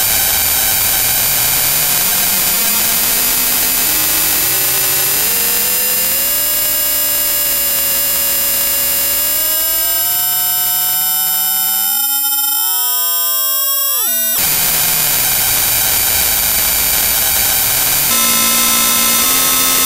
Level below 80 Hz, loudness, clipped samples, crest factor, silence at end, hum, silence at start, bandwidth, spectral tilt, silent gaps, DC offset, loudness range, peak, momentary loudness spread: -38 dBFS; -10 LUFS; 0.2%; 14 dB; 0 s; none; 0 s; over 20 kHz; 0 dB/octave; none; under 0.1%; 1 LU; 0 dBFS; 2 LU